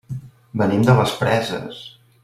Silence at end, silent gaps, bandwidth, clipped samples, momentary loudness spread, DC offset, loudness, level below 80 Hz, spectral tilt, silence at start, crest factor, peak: 0.35 s; none; 14.5 kHz; under 0.1%; 19 LU; under 0.1%; -19 LUFS; -50 dBFS; -6.5 dB/octave; 0.1 s; 18 dB; -2 dBFS